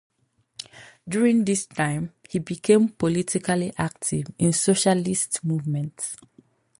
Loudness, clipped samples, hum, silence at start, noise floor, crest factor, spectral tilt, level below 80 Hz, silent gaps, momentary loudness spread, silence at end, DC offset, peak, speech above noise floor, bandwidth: -23 LUFS; under 0.1%; none; 0.6 s; -48 dBFS; 20 dB; -5 dB/octave; -58 dBFS; none; 20 LU; 0.65 s; under 0.1%; -4 dBFS; 25 dB; 11.5 kHz